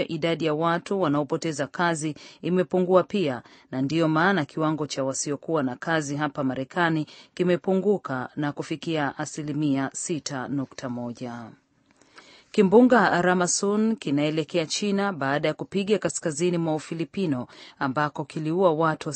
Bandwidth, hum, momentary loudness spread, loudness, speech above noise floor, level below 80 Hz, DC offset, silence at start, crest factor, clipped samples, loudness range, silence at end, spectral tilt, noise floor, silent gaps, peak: 8.8 kHz; none; 10 LU; -25 LUFS; 37 dB; -68 dBFS; under 0.1%; 0 s; 20 dB; under 0.1%; 7 LU; 0 s; -5 dB/octave; -61 dBFS; none; -4 dBFS